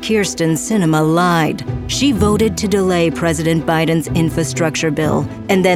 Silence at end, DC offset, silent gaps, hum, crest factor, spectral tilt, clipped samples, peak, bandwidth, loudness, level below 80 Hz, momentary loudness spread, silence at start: 0 s; under 0.1%; none; none; 14 dB; -5 dB/octave; under 0.1%; 0 dBFS; 15.5 kHz; -16 LUFS; -36 dBFS; 4 LU; 0 s